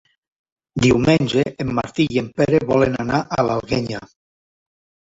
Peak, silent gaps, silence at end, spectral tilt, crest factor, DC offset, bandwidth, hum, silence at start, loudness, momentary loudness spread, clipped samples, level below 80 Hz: -2 dBFS; none; 1.1 s; -6.5 dB/octave; 18 dB; under 0.1%; 8 kHz; none; 0.75 s; -19 LUFS; 8 LU; under 0.1%; -46 dBFS